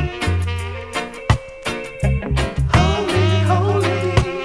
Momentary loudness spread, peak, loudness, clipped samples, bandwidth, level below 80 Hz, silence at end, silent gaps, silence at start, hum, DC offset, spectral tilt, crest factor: 10 LU; 0 dBFS; -19 LUFS; under 0.1%; 11 kHz; -28 dBFS; 0 s; none; 0 s; none; under 0.1%; -6 dB/octave; 18 dB